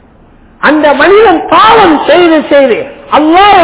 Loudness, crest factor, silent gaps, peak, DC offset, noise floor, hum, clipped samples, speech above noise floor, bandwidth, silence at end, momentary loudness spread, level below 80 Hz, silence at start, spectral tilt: -5 LUFS; 6 dB; none; 0 dBFS; under 0.1%; -38 dBFS; none; 10%; 34 dB; 4 kHz; 0 s; 7 LU; -36 dBFS; 0.6 s; -8 dB/octave